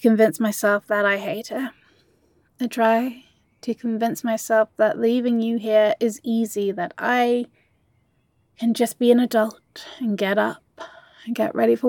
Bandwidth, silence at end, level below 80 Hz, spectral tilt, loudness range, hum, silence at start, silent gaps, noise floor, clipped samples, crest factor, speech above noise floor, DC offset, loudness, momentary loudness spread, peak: 17.5 kHz; 0 s; -74 dBFS; -5 dB/octave; 3 LU; none; 0 s; none; -65 dBFS; under 0.1%; 18 dB; 45 dB; under 0.1%; -22 LUFS; 13 LU; -4 dBFS